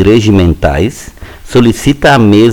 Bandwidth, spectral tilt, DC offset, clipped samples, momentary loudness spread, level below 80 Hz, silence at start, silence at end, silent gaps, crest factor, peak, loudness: 19 kHz; -6.5 dB/octave; under 0.1%; 3%; 10 LU; -24 dBFS; 0 s; 0 s; none; 8 dB; 0 dBFS; -8 LUFS